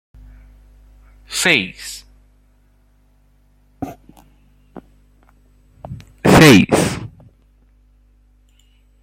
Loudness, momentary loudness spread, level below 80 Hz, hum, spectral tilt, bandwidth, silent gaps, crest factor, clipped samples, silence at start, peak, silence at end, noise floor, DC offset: -12 LUFS; 28 LU; -44 dBFS; 50 Hz at -45 dBFS; -4.5 dB/octave; 16.5 kHz; none; 20 dB; under 0.1%; 1.3 s; 0 dBFS; 1.95 s; -54 dBFS; under 0.1%